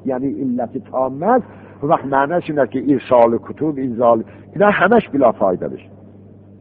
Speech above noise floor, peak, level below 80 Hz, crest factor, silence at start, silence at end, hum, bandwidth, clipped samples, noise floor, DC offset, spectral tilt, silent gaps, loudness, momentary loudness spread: 25 dB; 0 dBFS; -54 dBFS; 18 dB; 0.05 s; 0.65 s; none; 4.5 kHz; under 0.1%; -42 dBFS; under 0.1%; -5.5 dB/octave; none; -17 LUFS; 10 LU